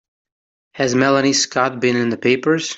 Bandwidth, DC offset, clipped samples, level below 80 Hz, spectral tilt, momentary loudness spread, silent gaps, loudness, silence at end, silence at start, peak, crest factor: 8.2 kHz; under 0.1%; under 0.1%; -62 dBFS; -3.5 dB/octave; 4 LU; none; -17 LUFS; 0 s; 0.75 s; -2 dBFS; 16 dB